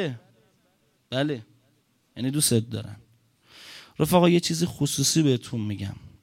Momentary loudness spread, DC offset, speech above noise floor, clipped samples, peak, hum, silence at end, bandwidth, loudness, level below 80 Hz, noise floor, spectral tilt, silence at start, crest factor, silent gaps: 22 LU; under 0.1%; 43 dB; under 0.1%; -6 dBFS; none; 0.15 s; 16.5 kHz; -24 LUFS; -58 dBFS; -67 dBFS; -4.5 dB/octave; 0 s; 20 dB; none